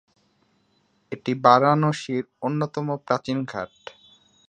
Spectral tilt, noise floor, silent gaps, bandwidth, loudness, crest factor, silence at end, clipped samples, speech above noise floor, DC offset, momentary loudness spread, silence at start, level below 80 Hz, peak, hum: -6.5 dB/octave; -66 dBFS; none; 9.6 kHz; -23 LUFS; 24 dB; 0.8 s; under 0.1%; 43 dB; under 0.1%; 20 LU; 1.1 s; -68 dBFS; -2 dBFS; none